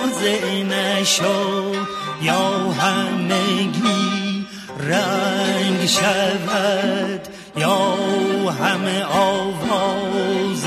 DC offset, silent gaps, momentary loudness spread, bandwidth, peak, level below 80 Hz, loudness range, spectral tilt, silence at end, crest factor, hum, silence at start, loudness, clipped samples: under 0.1%; none; 7 LU; 15 kHz; -4 dBFS; -58 dBFS; 1 LU; -4 dB/octave; 0 s; 14 dB; none; 0 s; -19 LUFS; under 0.1%